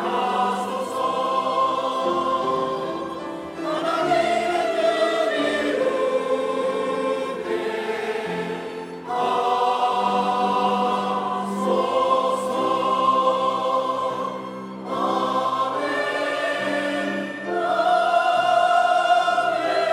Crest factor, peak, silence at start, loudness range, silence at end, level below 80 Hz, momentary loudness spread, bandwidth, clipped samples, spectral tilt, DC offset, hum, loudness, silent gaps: 16 dB; -6 dBFS; 0 s; 3 LU; 0 s; -66 dBFS; 9 LU; 14.5 kHz; under 0.1%; -4.5 dB/octave; under 0.1%; none; -22 LUFS; none